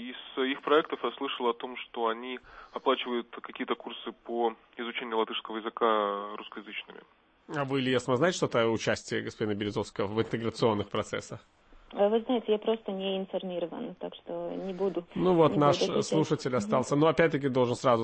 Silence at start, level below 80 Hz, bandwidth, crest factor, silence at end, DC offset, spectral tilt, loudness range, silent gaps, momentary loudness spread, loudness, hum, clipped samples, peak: 0 s; -64 dBFS; 8.8 kHz; 20 dB; 0 s; under 0.1%; -5.5 dB/octave; 6 LU; none; 14 LU; -30 LUFS; none; under 0.1%; -10 dBFS